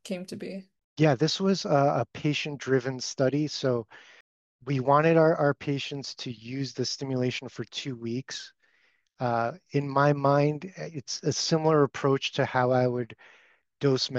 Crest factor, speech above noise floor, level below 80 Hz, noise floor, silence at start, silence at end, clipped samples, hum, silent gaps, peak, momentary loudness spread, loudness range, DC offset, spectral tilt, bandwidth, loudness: 18 dB; 42 dB; -70 dBFS; -68 dBFS; 0.05 s; 0 s; under 0.1%; none; 0.84-0.96 s, 4.20-4.59 s; -8 dBFS; 15 LU; 6 LU; under 0.1%; -5.5 dB/octave; 9.4 kHz; -27 LUFS